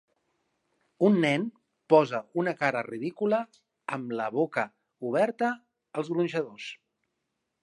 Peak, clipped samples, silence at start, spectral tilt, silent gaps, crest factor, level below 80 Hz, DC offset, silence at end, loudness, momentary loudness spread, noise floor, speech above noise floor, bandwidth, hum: -6 dBFS; under 0.1%; 1 s; -6.5 dB/octave; none; 22 dB; -82 dBFS; under 0.1%; 0.85 s; -28 LUFS; 15 LU; -82 dBFS; 54 dB; 11.5 kHz; none